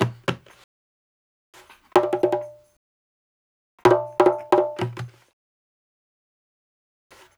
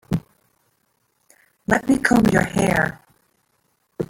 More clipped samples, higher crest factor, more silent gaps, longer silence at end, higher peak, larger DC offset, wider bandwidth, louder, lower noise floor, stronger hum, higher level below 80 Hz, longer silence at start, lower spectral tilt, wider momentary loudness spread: neither; about the same, 24 dB vs 20 dB; first, 0.64-1.53 s, 2.77-3.78 s vs none; first, 2.3 s vs 0.05 s; about the same, -2 dBFS vs -2 dBFS; neither; second, 15 kHz vs 17 kHz; second, -22 LUFS vs -19 LUFS; first, under -90 dBFS vs -68 dBFS; neither; second, -62 dBFS vs -46 dBFS; about the same, 0 s vs 0.1 s; about the same, -6.5 dB/octave vs -6 dB/octave; first, 19 LU vs 12 LU